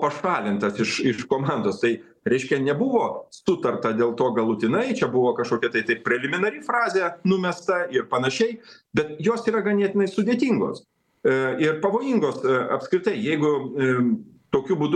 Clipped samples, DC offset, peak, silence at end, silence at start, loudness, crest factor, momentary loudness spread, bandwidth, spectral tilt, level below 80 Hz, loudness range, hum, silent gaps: under 0.1%; under 0.1%; -6 dBFS; 0 s; 0 s; -23 LUFS; 18 dB; 4 LU; 10 kHz; -6 dB/octave; -64 dBFS; 1 LU; none; none